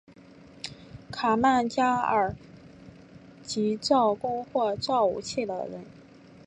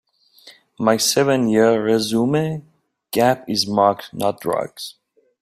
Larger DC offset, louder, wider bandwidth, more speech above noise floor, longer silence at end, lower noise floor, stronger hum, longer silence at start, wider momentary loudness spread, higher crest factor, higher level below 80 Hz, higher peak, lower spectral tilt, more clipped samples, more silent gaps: neither; second, -26 LUFS vs -18 LUFS; second, 11 kHz vs 16 kHz; second, 26 dB vs 31 dB; about the same, 0.45 s vs 0.5 s; about the same, -51 dBFS vs -49 dBFS; neither; first, 0.65 s vs 0.45 s; first, 17 LU vs 10 LU; about the same, 18 dB vs 18 dB; about the same, -58 dBFS vs -60 dBFS; second, -10 dBFS vs -2 dBFS; about the same, -4.5 dB/octave vs -4.5 dB/octave; neither; neither